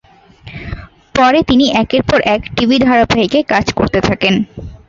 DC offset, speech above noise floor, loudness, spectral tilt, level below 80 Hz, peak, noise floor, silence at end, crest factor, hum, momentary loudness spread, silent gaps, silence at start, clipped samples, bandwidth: under 0.1%; 27 dB; -12 LUFS; -5.5 dB/octave; -34 dBFS; 0 dBFS; -38 dBFS; 0.15 s; 14 dB; none; 17 LU; none; 0.45 s; under 0.1%; 7.6 kHz